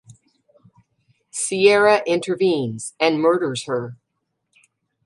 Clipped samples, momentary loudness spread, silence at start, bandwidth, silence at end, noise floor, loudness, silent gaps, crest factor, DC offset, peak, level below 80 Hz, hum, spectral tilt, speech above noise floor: under 0.1%; 13 LU; 0.1 s; 11.5 kHz; 1.1 s; -76 dBFS; -19 LUFS; none; 20 dB; under 0.1%; -2 dBFS; -70 dBFS; none; -4 dB/octave; 57 dB